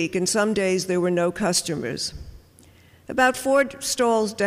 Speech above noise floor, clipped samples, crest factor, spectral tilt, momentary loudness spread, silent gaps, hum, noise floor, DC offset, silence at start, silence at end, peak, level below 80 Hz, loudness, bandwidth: 30 dB; under 0.1%; 16 dB; -3.5 dB/octave; 8 LU; none; none; -52 dBFS; under 0.1%; 0 s; 0 s; -8 dBFS; -52 dBFS; -22 LUFS; 15.5 kHz